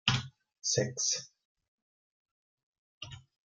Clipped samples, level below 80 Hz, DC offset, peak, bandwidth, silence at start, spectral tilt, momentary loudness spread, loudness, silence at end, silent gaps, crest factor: under 0.1%; -64 dBFS; under 0.1%; -12 dBFS; 10.5 kHz; 0.05 s; -2.5 dB/octave; 19 LU; -32 LUFS; 0.25 s; 1.45-1.55 s, 1.68-2.25 s, 2.31-3.01 s; 26 dB